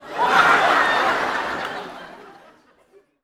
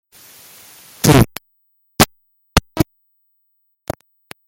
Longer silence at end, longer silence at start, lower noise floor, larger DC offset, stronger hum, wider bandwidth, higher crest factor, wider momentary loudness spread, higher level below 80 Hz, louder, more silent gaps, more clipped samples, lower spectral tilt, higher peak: second, 0.95 s vs 1.65 s; second, 0 s vs 1.05 s; second, -56 dBFS vs -66 dBFS; neither; neither; about the same, 17 kHz vs 17 kHz; about the same, 20 dB vs 20 dB; second, 19 LU vs 27 LU; second, -58 dBFS vs -36 dBFS; about the same, -18 LUFS vs -16 LUFS; neither; neither; second, -2.5 dB/octave vs -4.5 dB/octave; about the same, -2 dBFS vs 0 dBFS